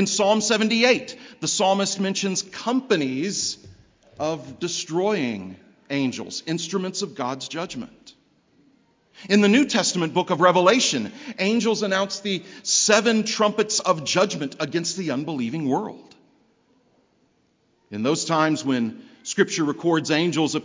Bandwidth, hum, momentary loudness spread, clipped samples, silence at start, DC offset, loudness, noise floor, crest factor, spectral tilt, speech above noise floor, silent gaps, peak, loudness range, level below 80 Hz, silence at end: 7.8 kHz; none; 12 LU; under 0.1%; 0 s; under 0.1%; -22 LUFS; -65 dBFS; 22 dB; -3.5 dB/octave; 43 dB; none; -2 dBFS; 9 LU; -68 dBFS; 0 s